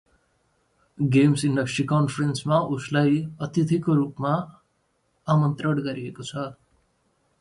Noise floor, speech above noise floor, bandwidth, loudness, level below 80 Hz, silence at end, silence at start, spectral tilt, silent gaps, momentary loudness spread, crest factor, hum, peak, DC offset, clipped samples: -70 dBFS; 47 dB; 11.5 kHz; -24 LUFS; -60 dBFS; 0.9 s; 1 s; -7 dB/octave; none; 13 LU; 18 dB; none; -6 dBFS; under 0.1%; under 0.1%